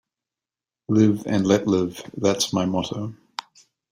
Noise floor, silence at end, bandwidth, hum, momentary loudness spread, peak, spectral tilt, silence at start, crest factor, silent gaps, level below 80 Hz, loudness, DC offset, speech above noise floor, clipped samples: under -90 dBFS; 0.8 s; 16 kHz; none; 15 LU; -4 dBFS; -5.5 dB/octave; 0.9 s; 20 dB; none; -58 dBFS; -22 LUFS; under 0.1%; over 69 dB; under 0.1%